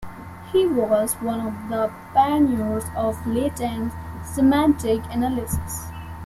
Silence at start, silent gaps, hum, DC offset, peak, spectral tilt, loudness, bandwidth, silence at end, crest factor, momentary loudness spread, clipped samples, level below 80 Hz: 0 s; none; none; under 0.1%; -6 dBFS; -6 dB/octave; -22 LUFS; 15.5 kHz; 0 s; 16 dB; 12 LU; under 0.1%; -42 dBFS